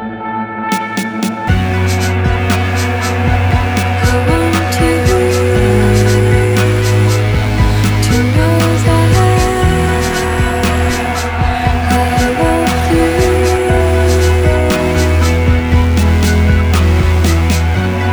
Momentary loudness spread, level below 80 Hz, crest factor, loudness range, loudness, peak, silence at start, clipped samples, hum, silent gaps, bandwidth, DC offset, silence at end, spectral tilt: 4 LU; -18 dBFS; 10 dB; 2 LU; -12 LUFS; 0 dBFS; 0 s; under 0.1%; none; none; over 20 kHz; under 0.1%; 0 s; -6 dB/octave